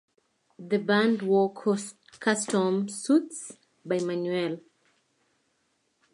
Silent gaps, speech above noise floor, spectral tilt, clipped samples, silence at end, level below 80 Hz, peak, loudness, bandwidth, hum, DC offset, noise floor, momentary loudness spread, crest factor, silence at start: none; 47 dB; -5 dB/octave; under 0.1%; 1.55 s; -80 dBFS; -10 dBFS; -27 LUFS; 11.5 kHz; none; under 0.1%; -73 dBFS; 16 LU; 18 dB; 0.6 s